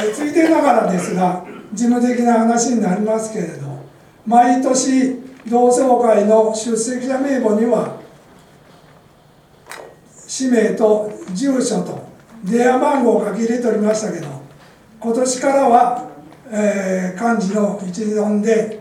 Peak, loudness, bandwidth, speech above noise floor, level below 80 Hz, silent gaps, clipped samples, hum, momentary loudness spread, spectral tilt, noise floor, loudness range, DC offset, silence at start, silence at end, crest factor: 0 dBFS; -16 LUFS; 13.5 kHz; 33 dB; -62 dBFS; none; under 0.1%; none; 15 LU; -5 dB/octave; -49 dBFS; 6 LU; under 0.1%; 0 s; 0 s; 16 dB